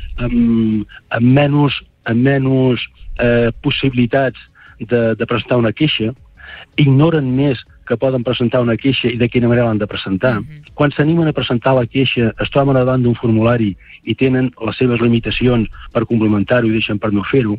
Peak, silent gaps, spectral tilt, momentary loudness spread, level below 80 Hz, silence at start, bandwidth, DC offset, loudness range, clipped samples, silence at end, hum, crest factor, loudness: -2 dBFS; none; -10 dB/octave; 8 LU; -36 dBFS; 0 s; 5 kHz; under 0.1%; 2 LU; under 0.1%; 0 s; none; 12 dB; -15 LUFS